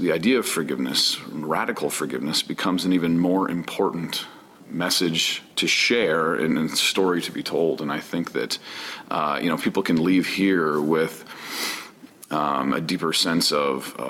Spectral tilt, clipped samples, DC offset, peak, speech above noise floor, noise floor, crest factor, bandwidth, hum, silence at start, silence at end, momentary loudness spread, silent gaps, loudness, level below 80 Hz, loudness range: -3.5 dB/octave; under 0.1%; under 0.1%; -10 dBFS; 21 dB; -44 dBFS; 14 dB; 17 kHz; none; 0 s; 0 s; 9 LU; none; -23 LUFS; -64 dBFS; 3 LU